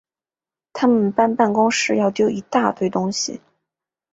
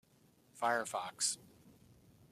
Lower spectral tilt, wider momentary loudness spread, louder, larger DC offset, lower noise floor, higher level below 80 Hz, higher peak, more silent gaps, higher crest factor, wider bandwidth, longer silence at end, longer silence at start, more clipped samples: first, -4.5 dB/octave vs -1 dB/octave; about the same, 8 LU vs 6 LU; first, -19 LUFS vs -37 LUFS; neither; first, under -90 dBFS vs -69 dBFS; first, -62 dBFS vs -80 dBFS; first, -2 dBFS vs -20 dBFS; neither; about the same, 18 dB vs 20 dB; second, 8 kHz vs 15 kHz; first, 0.75 s vs 0.6 s; first, 0.75 s vs 0.55 s; neither